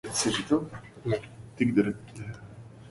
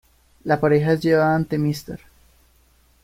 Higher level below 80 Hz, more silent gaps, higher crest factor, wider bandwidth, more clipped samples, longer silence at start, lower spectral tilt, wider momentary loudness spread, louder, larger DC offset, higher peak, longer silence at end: second, -58 dBFS vs -52 dBFS; neither; about the same, 20 dB vs 18 dB; second, 11.5 kHz vs 16 kHz; neither; second, 0.05 s vs 0.45 s; second, -4.5 dB/octave vs -7.5 dB/octave; about the same, 20 LU vs 18 LU; second, -29 LUFS vs -20 LUFS; neither; second, -10 dBFS vs -4 dBFS; second, 0 s vs 1.1 s